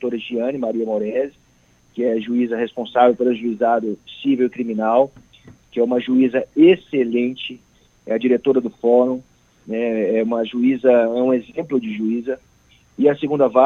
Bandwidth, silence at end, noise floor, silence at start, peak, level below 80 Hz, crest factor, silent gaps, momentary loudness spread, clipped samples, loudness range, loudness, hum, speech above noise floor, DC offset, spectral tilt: 6.6 kHz; 0 s; -56 dBFS; 0 s; 0 dBFS; -62 dBFS; 18 dB; none; 10 LU; under 0.1%; 2 LU; -19 LUFS; none; 38 dB; under 0.1%; -7.5 dB/octave